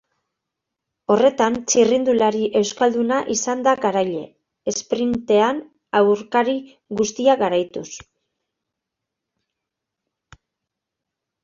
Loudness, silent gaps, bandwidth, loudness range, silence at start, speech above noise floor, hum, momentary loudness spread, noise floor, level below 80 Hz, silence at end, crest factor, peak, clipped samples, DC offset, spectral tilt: -19 LUFS; none; 7.6 kHz; 6 LU; 1.1 s; 64 dB; none; 13 LU; -83 dBFS; -60 dBFS; 3.45 s; 18 dB; -2 dBFS; under 0.1%; under 0.1%; -3.5 dB/octave